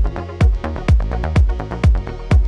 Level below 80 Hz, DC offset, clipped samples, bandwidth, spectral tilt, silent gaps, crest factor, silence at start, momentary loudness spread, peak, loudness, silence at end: -18 dBFS; under 0.1%; under 0.1%; 8.8 kHz; -8 dB/octave; none; 12 dB; 0 s; 5 LU; -4 dBFS; -18 LUFS; 0 s